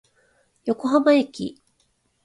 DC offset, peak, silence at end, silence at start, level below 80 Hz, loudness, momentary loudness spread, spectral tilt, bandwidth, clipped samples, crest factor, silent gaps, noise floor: under 0.1%; -6 dBFS; 0.75 s; 0.65 s; -66 dBFS; -21 LUFS; 16 LU; -5.5 dB/octave; 11.5 kHz; under 0.1%; 18 dB; none; -67 dBFS